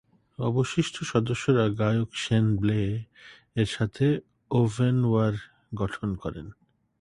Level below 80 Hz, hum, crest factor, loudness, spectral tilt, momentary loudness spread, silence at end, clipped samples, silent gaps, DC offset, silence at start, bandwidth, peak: -50 dBFS; none; 18 dB; -27 LUFS; -6.5 dB/octave; 12 LU; 0.5 s; under 0.1%; none; under 0.1%; 0.4 s; 11 kHz; -8 dBFS